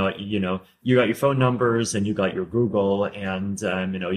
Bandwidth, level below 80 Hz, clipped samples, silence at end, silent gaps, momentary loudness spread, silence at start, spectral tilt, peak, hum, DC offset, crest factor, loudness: 15 kHz; -58 dBFS; under 0.1%; 0 s; none; 7 LU; 0 s; -6 dB/octave; -6 dBFS; none; under 0.1%; 16 dB; -23 LUFS